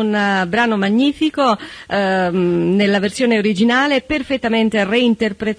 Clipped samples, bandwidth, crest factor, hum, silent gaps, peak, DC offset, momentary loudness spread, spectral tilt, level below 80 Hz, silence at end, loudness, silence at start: under 0.1%; 11 kHz; 12 dB; none; none; -4 dBFS; under 0.1%; 4 LU; -5.5 dB/octave; -48 dBFS; 0.05 s; -16 LUFS; 0 s